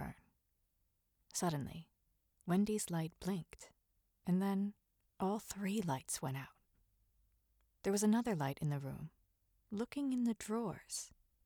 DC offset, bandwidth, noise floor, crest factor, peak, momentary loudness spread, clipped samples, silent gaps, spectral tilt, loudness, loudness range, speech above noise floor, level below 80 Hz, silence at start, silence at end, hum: under 0.1%; 20 kHz; -81 dBFS; 18 dB; -24 dBFS; 15 LU; under 0.1%; none; -5.5 dB/octave; -40 LUFS; 3 LU; 43 dB; -68 dBFS; 0 s; 0.35 s; none